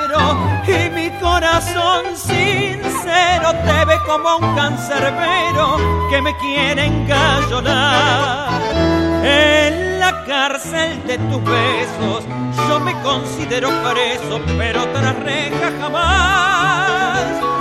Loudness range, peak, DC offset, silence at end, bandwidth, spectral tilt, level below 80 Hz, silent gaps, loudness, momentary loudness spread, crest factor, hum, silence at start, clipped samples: 4 LU; 0 dBFS; under 0.1%; 0 s; 15.5 kHz; -4.5 dB/octave; -34 dBFS; none; -15 LUFS; 6 LU; 14 dB; none; 0 s; under 0.1%